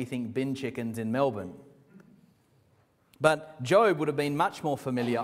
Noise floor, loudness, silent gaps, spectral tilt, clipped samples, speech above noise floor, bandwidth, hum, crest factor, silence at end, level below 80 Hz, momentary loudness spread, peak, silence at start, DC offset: -66 dBFS; -28 LUFS; none; -6 dB/octave; under 0.1%; 38 dB; 16 kHz; none; 24 dB; 0 s; -70 dBFS; 11 LU; -6 dBFS; 0 s; under 0.1%